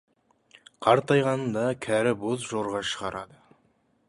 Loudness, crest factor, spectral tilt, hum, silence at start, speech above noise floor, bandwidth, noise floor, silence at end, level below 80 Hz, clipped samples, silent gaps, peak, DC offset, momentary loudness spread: -26 LUFS; 22 dB; -5 dB/octave; none; 0.8 s; 42 dB; 11.5 kHz; -67 dBFS; 0.85 s; -62 dBFS; under 0.1%; none; -6 dBFS; under 0.1%; 11 LU